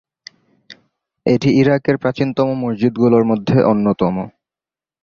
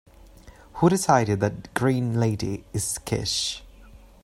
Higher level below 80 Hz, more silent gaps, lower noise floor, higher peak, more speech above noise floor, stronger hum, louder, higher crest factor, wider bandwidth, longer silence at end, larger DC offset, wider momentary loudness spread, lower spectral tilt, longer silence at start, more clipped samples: about the same, -52 dBFS vs -50 dBFS; neither; first, under -90 dBFS vs -48 dBFS; about the same, -2 dBFS vs -4 dBFS; first, over 75 dB vs 25 dB; neither; first, -16 LUFS vs -24 LUFS; about the same, 16 dB vs 20 dB; second, 7 kHz vs 16 kHz; first, 0.75 s vs 0.25 s; neither; second, 6 LU vs 9 LU; first, -8 dB/octave vs -5 dB/octave; first, 0.7 s vs 0.45 s; neither